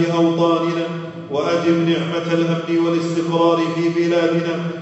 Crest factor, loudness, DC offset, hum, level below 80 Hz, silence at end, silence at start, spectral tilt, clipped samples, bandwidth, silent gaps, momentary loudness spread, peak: 14 dB; -18 LUFS; under 0.1%; none; -66 dBFS; 0 s; 0 s; -6.5 dB/octave; under 0.1%; 8.2 kHz; none; 7 LU; -4 dBFS